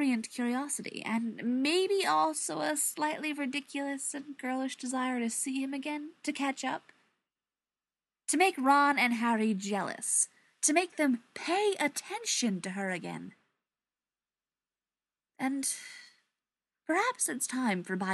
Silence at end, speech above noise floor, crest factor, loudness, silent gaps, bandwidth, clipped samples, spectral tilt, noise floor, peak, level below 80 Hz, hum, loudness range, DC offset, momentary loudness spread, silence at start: 0 s; over 59 dB; 20 dB; -31 LUFS; none; 12.5 kHz; under 0.1%; -2.5 dB/octave; under -90 dBFS; -14 dBFS; under -90 dBFS; none; 10 LU; under 0.1%; 10 LU; 0 s